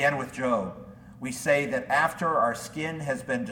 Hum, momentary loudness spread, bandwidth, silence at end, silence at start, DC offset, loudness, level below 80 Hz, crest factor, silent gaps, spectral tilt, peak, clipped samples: none; 13 LU; 18 kHz; 0 s; 0 s; under 0.1%; -27 LUFS; -60 dBFS; 18 dB; none; -5 dB/octave; -10 dBFS; under 0.1%